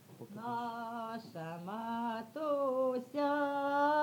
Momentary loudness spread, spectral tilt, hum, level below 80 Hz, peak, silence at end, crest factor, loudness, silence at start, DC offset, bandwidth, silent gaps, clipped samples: 11 LU; -6 dB/octave; none; under -90 dBFS; -20 dBFS; 0 s; 16 dB; -37 LUFS; 0 s; under 0.1%; 18.5 kHz; none; under 0.1%